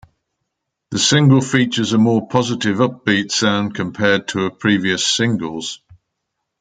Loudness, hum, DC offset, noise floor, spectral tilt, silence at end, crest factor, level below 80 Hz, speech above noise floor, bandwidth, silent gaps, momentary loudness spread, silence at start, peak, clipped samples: -16 LUFS; none; under 0.1%; -76 dBFS; -4.5 dB/octave; 0.85 s; 18 dB; -58 dBFS; 60 dB; 9.6 kHz; none; 10 LU; 0.9 s; 0 dBFS; under 0.1%